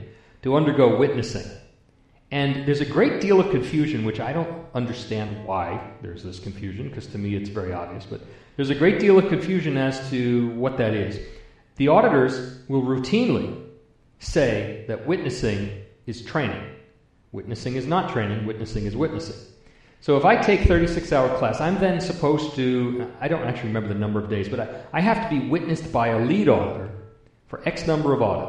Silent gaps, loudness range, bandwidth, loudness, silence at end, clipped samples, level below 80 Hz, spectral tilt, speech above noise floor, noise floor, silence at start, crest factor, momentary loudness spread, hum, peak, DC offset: none; 7 LU; 10 kHz; -23 LUFS; 0 s; under 0.1%; -40 dBFS; -7 dB/octave; 35 dB; -57 dBFS; 0 s; 20 dB; 16 LU; none; -2 dBFS; under 0.1%